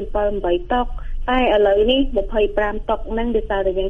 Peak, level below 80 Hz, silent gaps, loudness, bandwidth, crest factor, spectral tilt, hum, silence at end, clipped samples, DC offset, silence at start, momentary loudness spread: -4 dBFS; -28 dBFS; none; -19 LUFS; 3.8 kHz; 14 dB; -7 dB/octave; none; 0 s; under 0.1%; under 0.1%; 0 s; 8 LU